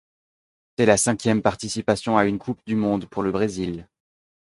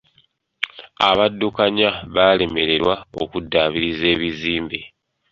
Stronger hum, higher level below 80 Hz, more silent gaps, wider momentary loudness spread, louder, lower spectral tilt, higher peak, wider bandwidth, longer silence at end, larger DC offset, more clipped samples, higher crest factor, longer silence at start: neither; second, -52 dBFS vs -46 dBFS; neither; about the same, 11 LU vs 12 LU; second, -22 LUFS vs -19 LUFS; about the same, -5 dB/octave vs -6 dB/octave; about the same, -2 dBFS vs 0 dBFS; first, 11.5 kHz vs 7.4 kHz; first, 0.6 s vs 0.45 s; neither; neither; about the same, 22 dB vs 20 dB; first, 0.8 s vs 0.6 s